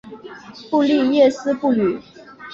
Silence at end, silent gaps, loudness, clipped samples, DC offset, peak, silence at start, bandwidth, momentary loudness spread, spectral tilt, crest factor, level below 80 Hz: 0 s; none; -18 LUFS; under 0.1%; under 0.1%; -4 dBFS; 0.05 s; 7.6 kHz; 22 LU; -6 dB/octave; 16 dB; -60 dBFS